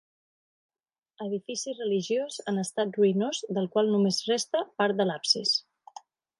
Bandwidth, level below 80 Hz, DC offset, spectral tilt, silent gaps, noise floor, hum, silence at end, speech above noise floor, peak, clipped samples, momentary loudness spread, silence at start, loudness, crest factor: 11.5 kHz; -82 dBFS; under 0.1%; -4 dB/octave; none; -51 dBFS; none; 0.8 s; 23 dB; -10 dBFS; under 0.1%; 8 LU; 1.2 s; -27 LUFS; 18 dB